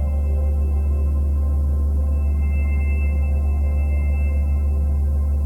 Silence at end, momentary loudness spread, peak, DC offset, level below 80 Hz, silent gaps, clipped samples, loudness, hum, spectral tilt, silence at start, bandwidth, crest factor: 0 s; 0 LU; -12 dBFS; under 0.1%; -18 dBFS; none; under 0.1%; -21 LUFS; none; -9.5 dB/octave; 0 s; 2.8 kHz; 6 dB